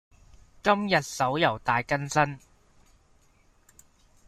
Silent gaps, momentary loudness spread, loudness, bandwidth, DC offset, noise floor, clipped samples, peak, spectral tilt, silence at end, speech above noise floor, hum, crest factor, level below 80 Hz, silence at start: none; 5 LU; -26 LUFS; 15.5 kHz; under 0.1%; -62 dBFS; under 0.1%; -8 dBFS; -4.5 dB/octave; 1.9 s; 36 dB; none; 22 dB; -58 dBFS; 0.65 s